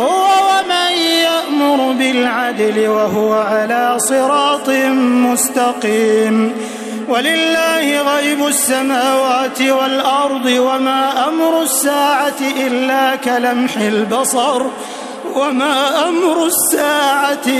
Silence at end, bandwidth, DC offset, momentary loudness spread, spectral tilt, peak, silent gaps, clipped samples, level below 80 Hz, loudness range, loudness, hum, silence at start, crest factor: 0 s; 14 kHz; under 0.1%; 4 LU; -2 dB/octave; -2 dBFS; none; under 0.1%; -62 dBFS; 2 LU; -14 LUFS; none; 0 s; 12 dB